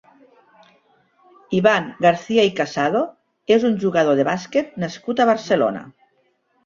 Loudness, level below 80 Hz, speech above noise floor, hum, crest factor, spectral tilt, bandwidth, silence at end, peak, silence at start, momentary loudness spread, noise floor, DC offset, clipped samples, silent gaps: -19 LUFS; -62 dBFS; 46 dB; none; 18 dB; -5.5 dB/octave; 7.6 kHz; 0.75 s; -2 dBFS; 1.5 s; 9 LU; -64 dBFS; under 0.1%; under 0.1%; none